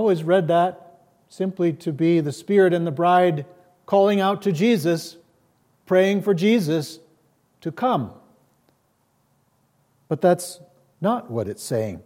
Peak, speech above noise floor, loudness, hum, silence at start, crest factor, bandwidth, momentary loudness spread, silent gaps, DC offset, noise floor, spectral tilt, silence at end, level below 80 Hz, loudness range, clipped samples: -6 dBFS; 46 dB; -21 LUFS; none; 0 s; 16 dB; 16.5 kHz; 12 LU; none; under 0.1%; -66 dBFS; -6.5 dB/octave; 0.05 s; -72 dBFS; 8 LU; under 0.1%